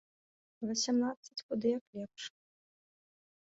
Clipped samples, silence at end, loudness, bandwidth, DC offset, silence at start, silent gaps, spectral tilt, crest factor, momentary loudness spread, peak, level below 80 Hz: under 0.1%; 1.15 s; -36 LUFS; 7.6 kHz; under 0.1%; 0.6 s; 1.17-1.23 s, 1.43-1.49 s, 1.81-1.93 s; -4 dB/octave; 18 dB; 14 LU; -20 dBFS; -80 dBFS